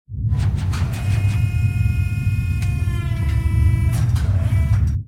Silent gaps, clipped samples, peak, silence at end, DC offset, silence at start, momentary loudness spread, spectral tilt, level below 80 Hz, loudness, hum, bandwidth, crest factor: none; under 0.1%; -6 dBFS; 0 s; under 0.1%; 0.1 s; 4 LU; -7 dB/octave; -24 dBFS; -20 LUFS; none; 14 kHz; 12 dB